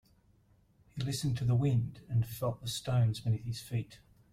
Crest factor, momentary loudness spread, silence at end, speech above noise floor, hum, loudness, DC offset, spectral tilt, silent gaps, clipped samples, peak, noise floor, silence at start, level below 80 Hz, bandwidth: 14 dB; 9 LU; 0.35 s; 35 dB; none; -33 LUFS; under 0.1%; -6.5 dB/octave; none; under 0.1%; -20 dBFS; -67 dBFS; 0.95 s; -58 dBFS; 15.5 kHz